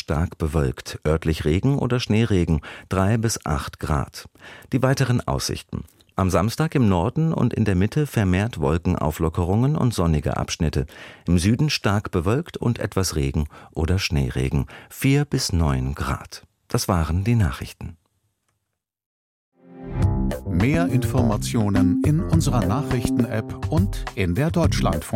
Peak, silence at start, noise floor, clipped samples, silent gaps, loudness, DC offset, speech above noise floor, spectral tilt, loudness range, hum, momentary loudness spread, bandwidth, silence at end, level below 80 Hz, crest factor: -4 dBFS; 0.1 s; -79 dBFS; under 0.1%; 19.06-19.52 s; -22 LUFS; under 0.1%; 58 dB; -6 dB/octave; 5 LU; none; 8 LU; 16.5 kHz; 0 s; -34 dBFS; 18 dB